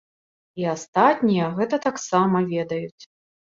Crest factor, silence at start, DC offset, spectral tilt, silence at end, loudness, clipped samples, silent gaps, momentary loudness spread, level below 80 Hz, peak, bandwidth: 20 dB; 0.55 s; under 0.1%; -6 dB/octave; 0.5 s; -22 LUFS; under 0.1%; 0.88-0.93 s, 2.92-2.98 s; 11 LU; -66 dBFS; -4 dBFS; 7.6 kHz